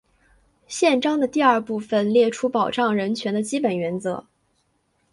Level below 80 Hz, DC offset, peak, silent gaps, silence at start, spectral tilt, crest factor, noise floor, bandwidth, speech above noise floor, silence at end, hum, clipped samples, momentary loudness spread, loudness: -66 dBFS; under 0.1%; -4 dBFS; none; 0.7 s; -5 dB/octave; 18 dB; -68 dBFS; 11.5 kHz; 47 dB; 0.9 s; none; under 0.1%; 8 LU; -21 LUFS